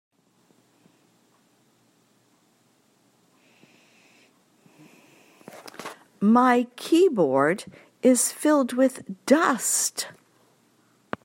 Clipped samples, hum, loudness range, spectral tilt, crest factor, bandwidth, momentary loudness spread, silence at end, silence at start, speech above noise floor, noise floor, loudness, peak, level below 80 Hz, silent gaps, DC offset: under 0.1%; none; 5 LU; -3.5 dB/octave; 20 dB; 16 kHz; 20 LU; 1.15 s; 5.55 s; 43 dB; -64 dBFS; -22 LUFS; -6 dBFS; -76 dBFS; none; under 0.1%